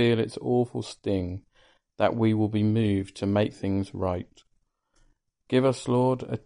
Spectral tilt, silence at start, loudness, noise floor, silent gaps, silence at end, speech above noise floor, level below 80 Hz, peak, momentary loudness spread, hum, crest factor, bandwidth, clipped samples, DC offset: -7.5 dB/octave; 0 s; -26 LUFS; -71 dBFS; none; 0.1 s; 45 dB; -58 dBFS; -10 dBFS; 7 LU; none; 16 dB; 10.5 kHz; under 0.1%; under 0.1%